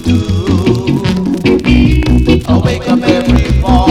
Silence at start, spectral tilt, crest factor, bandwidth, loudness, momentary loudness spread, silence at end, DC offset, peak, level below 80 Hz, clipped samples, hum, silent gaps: 0 s; -7 dB/octave; 10 dB; 13 kHz; -11 LUFS; 4 LU; 0 s; under 0.1%; 0 dBFS; -16 dBFS; under 0.1%; none; none